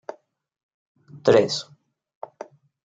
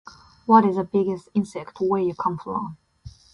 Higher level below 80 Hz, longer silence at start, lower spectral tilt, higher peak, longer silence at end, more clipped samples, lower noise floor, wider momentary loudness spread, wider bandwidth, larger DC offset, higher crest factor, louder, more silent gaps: second, -70 dBFS vs -56 dBFS; first, 1.15 s vs 0.5 s; second, -4.5 dB/octave vs -8 dB/octave; about the same, -4 dBFS vs -4 dBFS; first, 1.25 s vs 0.25 s; neither; about the same, -44 dBFS vs -46 dBFS; first, 25 LU vs 14 LU; second, 9.2 kHz vs 10.5 kHz; neither; about the same, 22 dB vs 20 dB; about the same, -21 LUFS vs -23 LUFS; neither